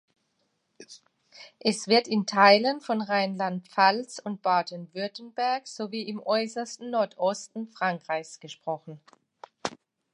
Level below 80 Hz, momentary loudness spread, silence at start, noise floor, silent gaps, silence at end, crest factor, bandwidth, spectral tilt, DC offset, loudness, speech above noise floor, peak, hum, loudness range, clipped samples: -80 dBFS; 15 LU; 0.8 s; -75 dBFS; none; 0.4 s; 24 dB; 11 kHz; -4 dB/octave; under 0.1%; -27 LUFS; 48 dB; -4 dBFS; none; 8 LU; under 0.1%